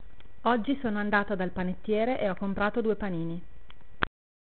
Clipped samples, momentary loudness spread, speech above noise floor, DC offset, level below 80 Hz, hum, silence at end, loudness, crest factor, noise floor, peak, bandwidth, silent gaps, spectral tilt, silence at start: under 0.1%; 7 LU; 24 dB; 2%; -50 dBFS; none; 0.35 s; -30 LUFS; 24 dB; -52 dBFS; -6 dBFS; 4.5 kHz; none; -5 dB/octave; 0.05 s